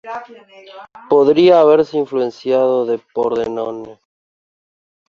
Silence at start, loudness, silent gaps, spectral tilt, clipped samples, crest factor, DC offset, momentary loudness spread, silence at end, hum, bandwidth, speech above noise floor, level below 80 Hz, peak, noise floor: 0.05 s; -15 LUFS; none; -7 dB/octave; under 0.1%; 14 dB; under 0.1%; 16 LU; 1.2 s; none; 7 kHz; over 75 dB; -60 dBFS; -2 dBFS; under -90 dBFS